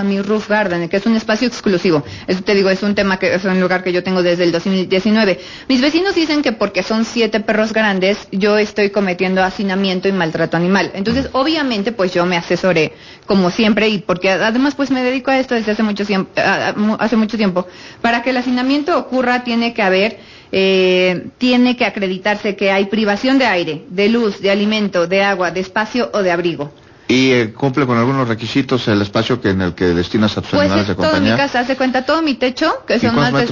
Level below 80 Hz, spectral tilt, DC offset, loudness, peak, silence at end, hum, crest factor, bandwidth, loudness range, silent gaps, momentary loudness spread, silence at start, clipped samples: -44 dBFS; -5.5 dB/octave; under 0.1%; -15 LUFS; -4 dBFS; 0 s; none; 12 dB; 7.4 kHz; 1 LU; none; 4 LU; 0 s; under 0.1%